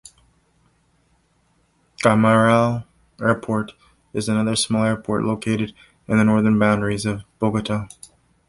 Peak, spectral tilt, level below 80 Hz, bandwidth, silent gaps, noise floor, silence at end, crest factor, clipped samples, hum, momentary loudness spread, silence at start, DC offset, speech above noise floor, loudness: -2 dBFS; -6 dB/octave; -52 dBFS; 11.5 kHz; none; -63 dBFS; 0.6 s; 18 dB; under 0.1%; none; 12 LU; 2 s; under 0.1%; 44 dB; -20 LUFS